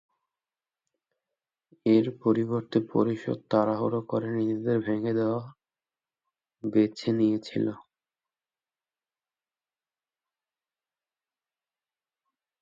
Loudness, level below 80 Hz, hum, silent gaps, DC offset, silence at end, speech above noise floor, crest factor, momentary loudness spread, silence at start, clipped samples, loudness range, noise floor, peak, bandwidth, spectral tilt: -27 LUFS; -72 dBFS; none; none; under 0.1%; 4.8 s; over 64 dB; 20 dB; 8 LU; 1.85 s; under 0.1%; 5 LU; under -90 dBFS; -10 dBFS; 7.6 kHz; -8.5 dB/octave